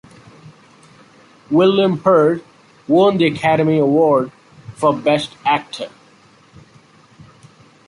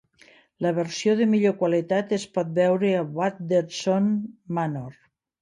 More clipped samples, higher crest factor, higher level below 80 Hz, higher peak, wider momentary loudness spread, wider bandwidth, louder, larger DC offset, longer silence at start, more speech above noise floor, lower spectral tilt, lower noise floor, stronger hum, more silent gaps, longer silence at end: neither; about the same, 16 dB vs 14 dB; first, -58 dBFS vs -70 dBFS; first, -2 dBFS vs -10 dBFS; first, 14 LU vs 8 LU; about the same, 11.5 kHz vs 10.5 kHz; first, -15 LUFS vs -24 LUFS; neither; first, 1.5 s vs 0.6 s; about the same, 35 dB vs 33 dB; about the same, -7 dB/octave vs -6 dB/octave; second, -49 dBFS vs -56 dBFS; neither; neither; first, 2 s vs 0.5 s